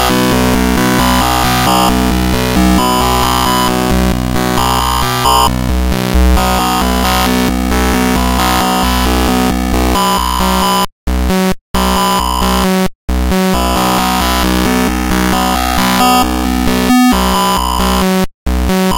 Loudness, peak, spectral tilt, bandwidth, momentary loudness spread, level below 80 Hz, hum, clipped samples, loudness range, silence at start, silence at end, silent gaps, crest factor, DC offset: -12 LUFS; 0 dBFS; -4.5 dB/octave; 16 kHz; 4 LU; -18 dBFS; none; under 0.1%; 2 LU; 0 s; 0 s; 10.92-11.07 s, 11.61-11.74 s, 12.95-13.08 s, 18.34-18.46 s; 10 dB; under 0.1%